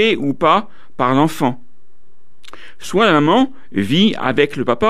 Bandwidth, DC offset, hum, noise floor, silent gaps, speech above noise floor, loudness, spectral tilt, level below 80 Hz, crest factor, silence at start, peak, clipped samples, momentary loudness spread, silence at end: 14.5 kHz; 4%; none; -60 dBFS; none; 44 dB; -16 LUFS; -6 dB/octave; -50 dBFS; 16 dB; 0 s; -2 dBFS; under 0.1%; 9 LU; 0 s